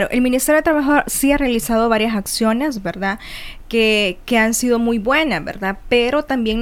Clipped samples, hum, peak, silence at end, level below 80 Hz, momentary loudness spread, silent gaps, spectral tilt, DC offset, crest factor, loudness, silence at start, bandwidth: under 0.1%; none; -2 dBFS; 0 s; -36 dBFS; 8 LU; none; -3.5 dB/octave; under 0.1%; 16 dB; -17 LUFS; 0 s; 18 kHz